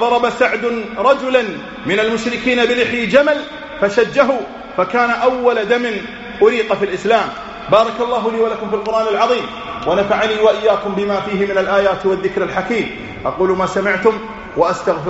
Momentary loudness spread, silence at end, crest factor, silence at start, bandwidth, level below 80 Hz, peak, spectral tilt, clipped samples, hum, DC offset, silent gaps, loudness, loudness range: 9 LU; 0 s; 16 dB; 0 s; 8 kHz; -46 dBFS; 0 dBFS; -2.5 dB/octave; under 0.1%; none; under 0.1%; none; -16 LUFS; 2 LU